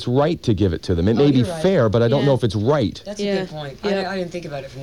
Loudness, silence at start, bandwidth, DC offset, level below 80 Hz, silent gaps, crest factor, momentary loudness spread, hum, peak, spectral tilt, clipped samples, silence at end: -19 LUFS; 0 s; 11.5 kHz; 0.3%; -42 dBFS; none; 14 dB; 10 LU; none; -6 dBFS; -7 dB/octave; under 0.1%; 0 s